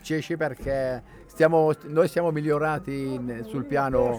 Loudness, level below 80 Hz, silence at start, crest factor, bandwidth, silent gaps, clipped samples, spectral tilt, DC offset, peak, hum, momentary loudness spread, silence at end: -25 LUFS; -48 dBFS; 0.05 s; 16 dB; 17.5 kHz; none; under 0.1%; -7 dB/octave; under 0.1%; -8 dBFS; none; 10 LU; 0 s